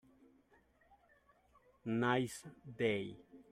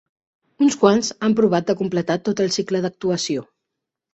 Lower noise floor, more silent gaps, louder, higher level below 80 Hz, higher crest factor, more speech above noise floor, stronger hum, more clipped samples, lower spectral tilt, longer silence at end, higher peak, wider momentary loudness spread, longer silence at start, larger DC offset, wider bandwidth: second, -71 dBFS vs -82 dBFS; neither; second, -38 LUFS vs -20 LUFS; second, -76 dBFS vs -60 dBFS; about the same, 20 dB vs 18 dB; second, 33 dB vs 63 dB; neither; neither; about the same, -5.5 dB/octave vs -5 dB/octave; second, 0.1 s vs 0.7 s; second, -22 dBFS vs -2 dBFS; first, 18 LU vs 7 LU; first, 1.85 s vs 0.6 s; neither; first, 14.5 kHz vs 8.2 kHz